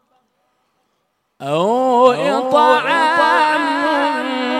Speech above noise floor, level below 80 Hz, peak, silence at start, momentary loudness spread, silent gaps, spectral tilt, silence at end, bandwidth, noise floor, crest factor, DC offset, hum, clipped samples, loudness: 53 dB; -72 dBFS; 0 dBFS; 1.4 s; 6 LU; none; -4.5 dB/octave; 0 s; 13 kHz; -68 dBFS; 16 dB; under 0.1%; none; under 0.1%; -14 LUFS